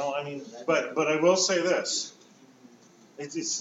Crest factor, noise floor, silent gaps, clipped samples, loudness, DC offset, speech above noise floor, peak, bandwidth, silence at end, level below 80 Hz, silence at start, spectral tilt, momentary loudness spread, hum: 18 dB; -56 dBFS; none; under 0.1%; -26 LUFS; under 0.1%; 29 dB; -10 dBFS; 8 kHz; 0 s; under -90 dBFS; 0 s; -2.5 dB/octave; 15 LU; none